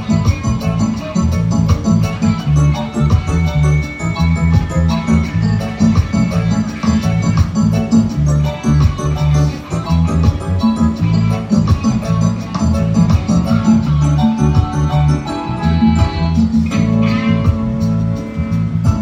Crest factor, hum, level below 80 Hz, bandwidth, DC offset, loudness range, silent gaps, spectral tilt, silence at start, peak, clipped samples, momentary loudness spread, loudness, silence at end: 12 dB; none; -24 dBFS; 10 kHz; under 0.1%; 1 LU; none; -7.5 dB/octave; 0 s; 0 dBFS; under 0.1%; 4 LU; -15 LUFS; 0 s